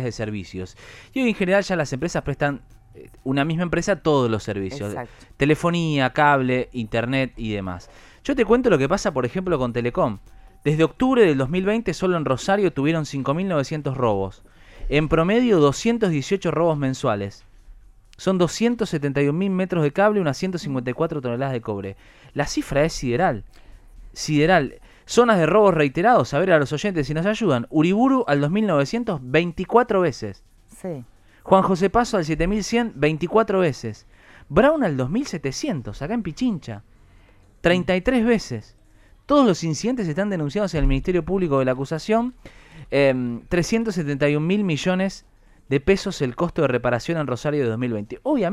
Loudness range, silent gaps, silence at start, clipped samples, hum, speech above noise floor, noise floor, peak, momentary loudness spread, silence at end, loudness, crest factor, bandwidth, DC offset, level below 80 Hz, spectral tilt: 4 LU; none; 0 s; under 0.1%; none; 31 dB; -52 dBFS; -2 dBFS; 12 LU; 0 s; -21 LUFS; 20 dB; 13.5 kHz; under 0.1%; -40 dBFS; -6 dB/octave